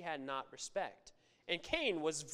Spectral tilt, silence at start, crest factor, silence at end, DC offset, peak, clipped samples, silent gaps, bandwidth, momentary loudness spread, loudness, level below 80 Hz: -2.5 dB/octave; 0 s; 22 dB; 0 s; under 0.1%; -18 dBFS; under 0.1%; none; 15 kHz; 9 LU; -40 LUFS; -68 dBFS